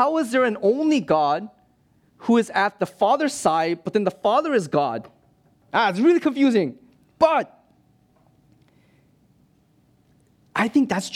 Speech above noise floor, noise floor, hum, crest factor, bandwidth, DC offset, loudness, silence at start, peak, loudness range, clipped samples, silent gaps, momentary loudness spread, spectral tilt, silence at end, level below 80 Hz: 41 dB; -61 dBFS; none; 18 dB; 14.5 kHz; under 0.1%; -21 LUFS; 0 s; -4 dBFS; 7 LU; under 0.1%; none; 8 LU; -5 dB/octave; 0 s; -66 dBFS